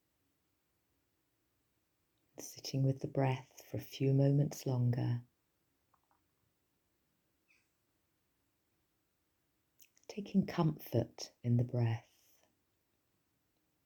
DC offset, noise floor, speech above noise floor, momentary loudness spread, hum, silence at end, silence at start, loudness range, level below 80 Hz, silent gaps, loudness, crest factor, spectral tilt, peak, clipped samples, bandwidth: under 0.1%; -81 dBFS; 47 dB; 14 LU; none; 1.85 s; 2.4 s; 8 LU; -74 dBFS; none; -36 LUFS; 22 dB; -7.5 dB/octave; -18 dBFS; under 0.1%; 20 kHz